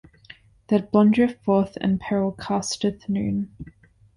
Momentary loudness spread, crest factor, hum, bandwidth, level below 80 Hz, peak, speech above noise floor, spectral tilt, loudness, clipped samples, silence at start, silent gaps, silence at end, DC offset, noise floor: 11 LU; 18 dB; none; 11 kHz; -52 dBFS; -6 dBFS; 28 dB; -6 dB/octave; -23 LUFS; under 0.1%; 0.7 s; none; 0.5 s; under 0.1%; -50 dBFS